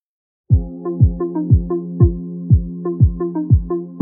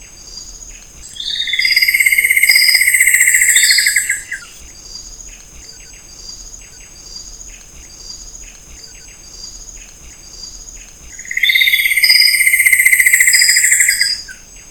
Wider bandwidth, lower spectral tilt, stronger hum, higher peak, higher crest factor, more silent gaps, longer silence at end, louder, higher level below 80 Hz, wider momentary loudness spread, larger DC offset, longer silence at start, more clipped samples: second, 1.9 kHz vs over 20 kHz; first, -17.5 dB/octave vs 3.5 dB/octave; neither; about the same, -2 dBFS vs 0 dBFS; about the same, 16 dB vs 16 dB; neither; about the same, 0 s vs 0.1 s; second, -18 LUFS vs -9 LUFS; first, -24 dBFS vs -42 dBFS; second, 8 LU vs 24 LU; second, under 0.1% vs 0.1%; first, 0.5 s vs 0 s; second, under 0.1% vs 0.3%